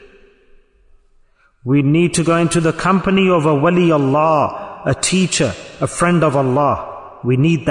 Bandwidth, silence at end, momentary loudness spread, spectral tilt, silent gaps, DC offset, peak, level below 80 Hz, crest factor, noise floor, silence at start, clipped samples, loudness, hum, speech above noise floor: 11 kHz; 0 s; 9 LU; -5.5 dB/octave; none; under 0.1%; -4 dBFS; -46 dBFS; 12 dB; -53 dBFS; 1.65 s; under 0.1%; -15 LUFS; none; 39 dB